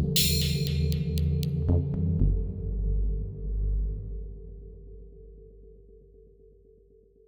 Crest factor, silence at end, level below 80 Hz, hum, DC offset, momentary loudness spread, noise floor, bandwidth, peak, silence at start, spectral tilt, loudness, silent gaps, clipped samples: 18 dB; 1.3 s; -32 dBFS; none; under 0.1%; 22 LU; -58 dBFS; over 20 kHz; -10 dBFS; 0 s; -5 dB/octave; -28 LUFS; none; under 0.1%